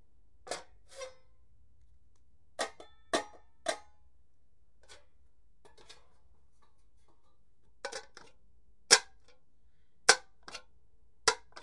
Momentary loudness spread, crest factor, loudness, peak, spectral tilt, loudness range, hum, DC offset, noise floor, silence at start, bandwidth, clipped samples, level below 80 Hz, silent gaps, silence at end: 24 LU; 34 dB; -31 LUFS; -4 dBFS; 1 dB/octave; 21 LU; none; 0.2%; -72 dBFS; 0.45 s; 11.5 kHz; under 0.1%; -70 dBFS; none; 0.25 s